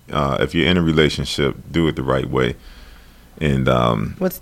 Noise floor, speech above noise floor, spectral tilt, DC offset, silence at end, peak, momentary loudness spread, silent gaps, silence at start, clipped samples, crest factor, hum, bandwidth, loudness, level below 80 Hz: -43 dBFS; 25 dB; -6 dB/octave; under 0.1%; 0.05 s; -2 dBFS; 6 LU; none; 0.1 s; under 0.1%; 18 dB; none; 16 kHz; -19 LUFS; -34 dBFS